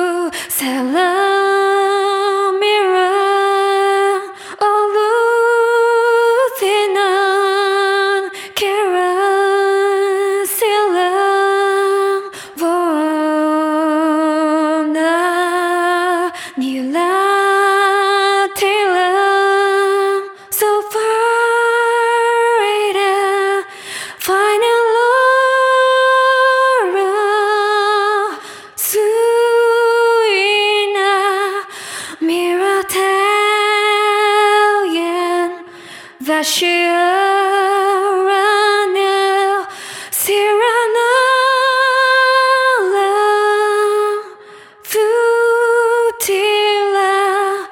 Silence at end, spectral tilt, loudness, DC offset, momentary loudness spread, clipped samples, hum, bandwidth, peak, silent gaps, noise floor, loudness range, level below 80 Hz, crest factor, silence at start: 0 s; -1 dB/octave; -14 LUFS; under 0.1%; 7 LU; under 0.1%; none; 18 kHz; -2 dBFS; none; -39 dBFS; 3 LU; -68 dBFS; 12 dB; 0 s